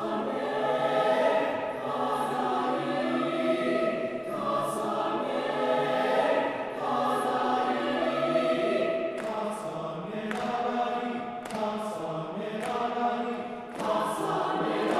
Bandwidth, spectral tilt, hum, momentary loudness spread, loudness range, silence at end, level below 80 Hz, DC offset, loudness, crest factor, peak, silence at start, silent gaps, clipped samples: 15 kHz; -5 dB/octave; none; 8 LU; 5 LU; 0 s; -68 dBFS; under 0.1%; -29 LUFS; 16 dB; -14 dBFS; 0 s; none; under 0.1%